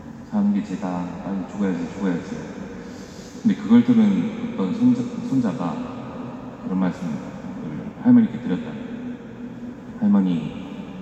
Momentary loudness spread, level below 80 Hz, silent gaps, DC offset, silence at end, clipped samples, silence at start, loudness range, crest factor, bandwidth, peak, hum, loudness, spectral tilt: 18 LU; -54 dBFS; none; under 0.1%; 0 s; under 0.1%; 0 s; 6 LU; 18 dB; 8 kHz; -6 dBFS; none; -22 LUFS; -8 dB/octave